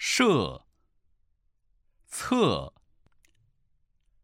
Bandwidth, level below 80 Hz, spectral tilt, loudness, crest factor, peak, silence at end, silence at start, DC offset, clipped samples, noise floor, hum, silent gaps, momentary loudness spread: 16 kHz; -56 dBFS; -4 dB/octave; -26 LUFS; 22 dB; -8 dBFS; 1.55 s; 0 s; under 0.1%; under 0.1%; -69 dBFS; none; none; 20 LU